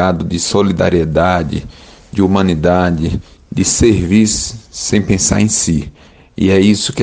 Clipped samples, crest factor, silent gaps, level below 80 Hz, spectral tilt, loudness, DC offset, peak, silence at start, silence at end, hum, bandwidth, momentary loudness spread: under 0.1%; 14 dB; none; -32 dBFS; -5 dB/octave; -13 LUFS; under 0.1%; 0 dBFS; 0 s; 0 s; none; 10 kHz; 12 LU